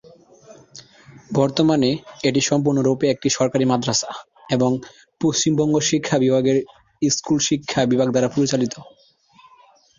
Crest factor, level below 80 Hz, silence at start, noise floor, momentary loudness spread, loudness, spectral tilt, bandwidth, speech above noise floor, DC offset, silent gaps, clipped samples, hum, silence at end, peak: 16 dB; -56 dBFS; 0.5 s; -53 dBFS; 7 LU; -20 LUFS; -4.5 dB/octave; 7.6 kHz; 34 dB; under 0.1%; none; under 0.1%; none; 1.1 s; -4 dBFS